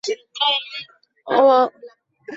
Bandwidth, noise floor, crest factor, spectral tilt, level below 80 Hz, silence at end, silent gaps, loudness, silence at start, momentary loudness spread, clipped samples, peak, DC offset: 7.8 kHz; -41 dBFS; 16 dB; -2 dB/octave; -74 dBFS; 0 s; none; -18 LUFS; 0.05 s; 16 LU; under 0.1%; -4 dBFS; under 0.1%